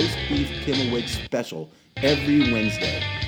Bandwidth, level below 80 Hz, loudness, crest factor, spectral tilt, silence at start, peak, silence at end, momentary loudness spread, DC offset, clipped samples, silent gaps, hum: 17.5 kHz; -40 dBFS; -23 LUFS; 16 dB; -5 dB/octave; 0 s; -6 dBFS; 0 s; 10 LU; under 0.1%; under 0.1%; none; none